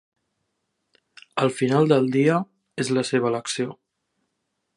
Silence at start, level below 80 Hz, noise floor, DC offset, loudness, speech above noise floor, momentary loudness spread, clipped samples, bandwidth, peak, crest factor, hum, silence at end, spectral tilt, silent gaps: 1.35 s; -70 dBFS; -77 dBFS; under 0.1%; -22 LUFS; 56 dB; 12 LU; under 0.1%; 11.5 kHz; -4 dBFS; 20 dB; none; 1.05 s; -5.5 dB/octave; none